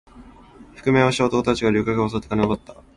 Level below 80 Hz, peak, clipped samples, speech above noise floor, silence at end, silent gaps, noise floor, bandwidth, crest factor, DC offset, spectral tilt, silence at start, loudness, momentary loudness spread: -44 dBFS; -4 dBFS; under 0.1%; 25 dB; 0.25 s; none; -46 dBFS; 11.5 kHz; 18 dB; under 0.1%; -6 dB/octave; 0.15 s; -21 LUFS; 6 LU